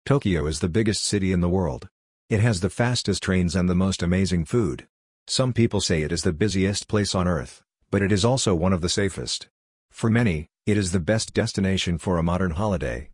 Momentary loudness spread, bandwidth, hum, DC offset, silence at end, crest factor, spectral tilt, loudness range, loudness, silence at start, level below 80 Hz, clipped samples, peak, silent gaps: 6 LU; 11 kHz; none; under 0.1%; 0 s; 16 dB; -5 dB/octave; 1 LU; -23 LUFS; 0.05 s; -44 dBFS; under 0.1%; -6 dBFS; 1.91-2.28 s, 4.89-5.26 s, 9.50-9.89 s